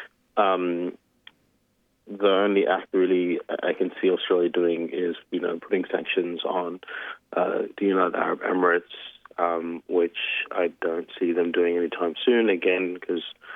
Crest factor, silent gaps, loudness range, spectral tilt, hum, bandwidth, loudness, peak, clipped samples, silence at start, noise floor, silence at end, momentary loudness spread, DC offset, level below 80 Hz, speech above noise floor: 18 dB; none; 3 LU; -7.5 dB/octave; none; 3.9 kHz; -25 LUFS; -6 dBFS; under 0.1%; 0 s; -69 dBFS; 0 s; 9 LU; under 0.1%; -76 dBFS; 44 dB